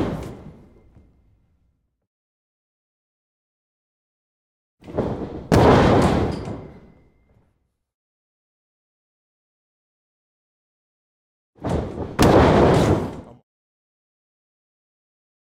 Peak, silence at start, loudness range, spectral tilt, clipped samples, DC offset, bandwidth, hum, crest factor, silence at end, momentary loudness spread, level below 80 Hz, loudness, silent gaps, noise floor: -2 dBFS; 0 s; 15 LU; -7 dB/octave; under 0.1%; under 0.1%; 16 kHz; none; 22 dB; 2.2 s; 19 LU; -38 dBFS; -18 LUFS; 2.07-4.77 s, 7.94-11.53 s; -69 dBFS